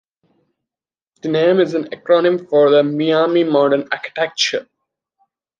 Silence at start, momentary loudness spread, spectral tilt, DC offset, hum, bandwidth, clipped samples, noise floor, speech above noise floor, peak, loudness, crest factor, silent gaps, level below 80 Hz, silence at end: 1.25 s; 9 LU; -5 dB/octave; under 0.1%; none; 9.4 kHz; under 0.1%; under -90 dBFS; over 75 dB; 0 dBFS; -16 LUFS; 16 dB; none; -70 dBFS; 0.95 s